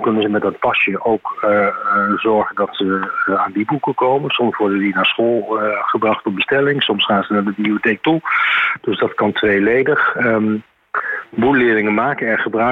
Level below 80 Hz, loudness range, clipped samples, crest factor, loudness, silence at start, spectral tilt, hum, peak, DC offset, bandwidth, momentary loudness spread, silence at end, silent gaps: -54 dBFS; 1 LU; under 0.1%; 12 dB; -16 LUFS; 0 s; -7.5 dB/octave; none; -4 dBFS; under 0.1%; 4.9 kHz; 5 LU; 0 s; none